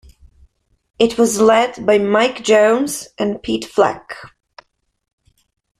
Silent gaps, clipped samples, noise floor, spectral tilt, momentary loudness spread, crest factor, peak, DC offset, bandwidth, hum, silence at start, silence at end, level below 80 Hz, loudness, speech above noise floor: none; under 0.1%; -54 dBFS; -3.5 dB/octave; 10 LU; 16 dB; -2 dBFS; under 0.1%; 14.5 kHz; none; 1 s; 1.55 s; -52 dBFS; -15 LUFS; 39 dB